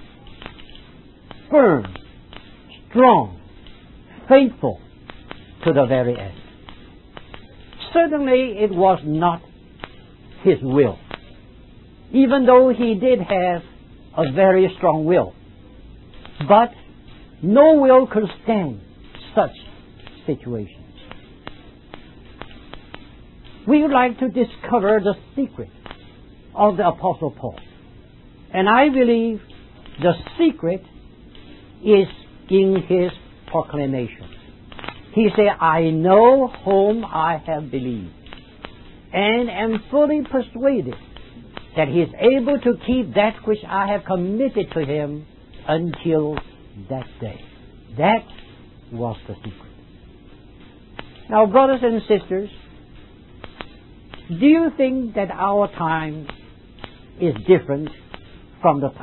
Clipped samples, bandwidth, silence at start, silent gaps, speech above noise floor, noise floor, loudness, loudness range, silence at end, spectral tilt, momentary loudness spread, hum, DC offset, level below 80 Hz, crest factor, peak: under 0.1%; 4.2 kHz; 0 s; none; 28 dB; -45 dBFS; -18 LUFS; 8 LU; 0 s; -11.5 dB/octave; 24 LU; none; under 0.1%; -46 dBFS; 20 dB; 0 dBFS